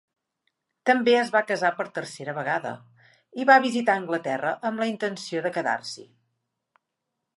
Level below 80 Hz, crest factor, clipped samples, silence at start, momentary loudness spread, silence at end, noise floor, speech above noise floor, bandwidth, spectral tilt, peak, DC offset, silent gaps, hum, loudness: -82 dBFS; 22 dB; under 0.1%; 0.85 s; 15 LU; 1.3 s; -82 dBFS; 58 dB; 11.5 kHz; -4.5 dB/octave; -4 dBFS; under 0.1%; none; none; -24 LUFS